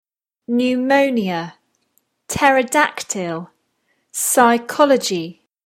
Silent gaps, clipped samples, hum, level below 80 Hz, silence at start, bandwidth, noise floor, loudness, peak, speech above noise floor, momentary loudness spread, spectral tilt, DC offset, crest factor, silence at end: none; under 0.1%; none; -54 dBFS; 0.5 s; 16.5 kHz; -67 dBFS; -17 LUFS; 0 dBFS; 50 dB; 13 LU; -3.5 dB/octave; under 0.1%; 18 dB; 0.35 s